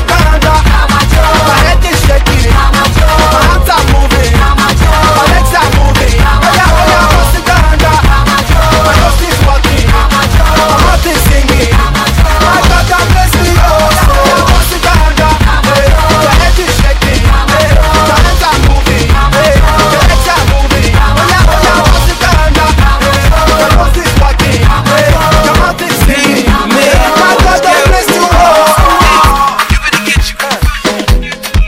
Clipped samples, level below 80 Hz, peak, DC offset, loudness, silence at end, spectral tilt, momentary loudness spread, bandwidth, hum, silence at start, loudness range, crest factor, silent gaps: 0.3%; -10 dBFS; 0 dBFS; under 0.1%; -7 LUFS; 0 s; -4.5 dB/octave; 3 LU; 16.5 kHz; none; 0 s; 1 LU; 6 dB; none